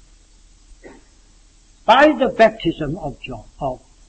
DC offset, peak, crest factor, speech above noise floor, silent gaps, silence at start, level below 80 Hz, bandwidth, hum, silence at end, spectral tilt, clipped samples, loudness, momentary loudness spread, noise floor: under 0.1%; 0 dBFS; 20 dB; 33 dB; none; 0.85 s; -44 dBFS; 8.6 kHz; none; 0.35 s; -5.5 dB/octave; under 0.1%; -17 LUFS; 17 LU; -50 dBFS